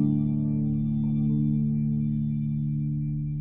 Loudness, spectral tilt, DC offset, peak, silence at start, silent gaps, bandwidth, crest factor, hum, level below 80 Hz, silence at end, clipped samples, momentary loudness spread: -27 LUFS; -13.5 dB/octave; under 0.1%; -14 dBFS; 0 s; none; 2.5 kHz; 12 dB; none; -42 dBFS; 0 s; under 0.1%; 4 LU